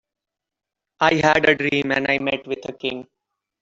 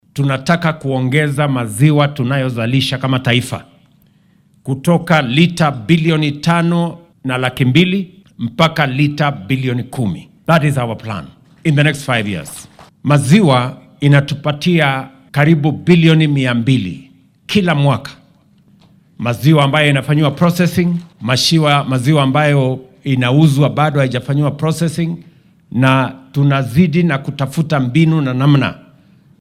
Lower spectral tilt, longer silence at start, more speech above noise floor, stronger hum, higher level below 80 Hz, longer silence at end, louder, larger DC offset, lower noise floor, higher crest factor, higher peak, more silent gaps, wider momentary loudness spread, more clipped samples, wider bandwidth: second, -5 dB/octave vs -6.5 dB/octave; first, 1 s vs 0.15 s; first, 66 dB vs 38 dB; neither; second, -56 dBFS vs -50 dBFS; about the same, 0.6 s vs 0.6 s; second, -19 LUFS vs -14 LUFS; neither; first, -86 dBFS vs -52 dBFS; first, 20 dB vs 14 dB; about the same, -2 dBFS vs 0 dBFS; neither; about the same, 12 LU vs 11 LU; neither; second, 7.8 kHz vs 14.5 kHz